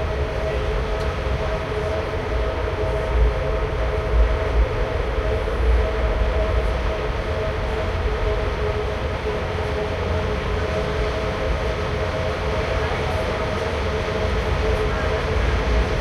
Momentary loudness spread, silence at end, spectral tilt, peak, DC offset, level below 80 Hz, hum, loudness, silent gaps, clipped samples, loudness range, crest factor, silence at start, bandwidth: 3 LU; 0 s; -6.5 dB/octave; -8 dBFS; under 0.1%; -24 dBFS; none; -23 LUFS; none; under 0.1%; 2 LU; 14 dB; 0 s; 10.5 kHz